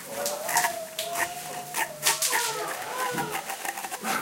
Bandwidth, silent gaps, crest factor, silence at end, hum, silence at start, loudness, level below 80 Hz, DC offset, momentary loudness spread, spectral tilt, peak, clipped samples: 17 kHz; none; 26 dB; 0 s; none; 0 s; -28 LUFS; -70 dBFS; under 0.1%; 9 LU; -0.5 dB/octave; -2 dBFS; under 0.1%